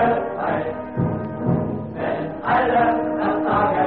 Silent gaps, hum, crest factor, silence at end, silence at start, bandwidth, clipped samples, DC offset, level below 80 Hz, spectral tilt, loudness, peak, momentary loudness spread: none; none; 14 dB; 0 s; 0 s; 4.6 kHz; under 0.1%; 0.3%; -46 dBFS; -6 dB/octave; -22 LUFS; -6 dBFS; 7 LU